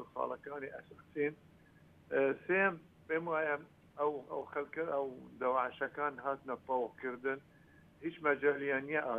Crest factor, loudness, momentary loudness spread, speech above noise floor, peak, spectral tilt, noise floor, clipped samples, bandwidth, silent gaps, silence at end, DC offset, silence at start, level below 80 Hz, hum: 20 dB; -37 LUFS; 13 LU; 26 dB; -18 dBFS; -7.5 dB/octave; -63 dBFS; under 0.1%; 4.1 kHz; none; 0 s; under 0.1%; 0 s; -76 dBFS; none